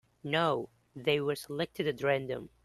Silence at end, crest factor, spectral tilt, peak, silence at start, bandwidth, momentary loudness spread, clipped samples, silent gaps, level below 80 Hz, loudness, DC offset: 0.15 s; 18 dB; -5.5 dB/octave; -14 dBFS; 0.25 s; 13 kHz; 7 LU; under 0.1%; none; -68 dBFS; -32 LUFS; under 0.1%